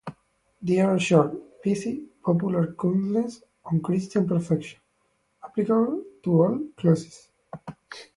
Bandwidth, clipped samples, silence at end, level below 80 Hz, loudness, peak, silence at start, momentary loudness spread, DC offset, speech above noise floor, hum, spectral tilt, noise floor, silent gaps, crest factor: 11.5 kHz; under 0.1%; 0.15 s; -64 dBFS; -25 LUFS; -4 dBFS; 0.05 s; 20 LU; under 0.1%; 47 dB; none; -7.5 dB/octave; -70 dBFS; none; 20 dB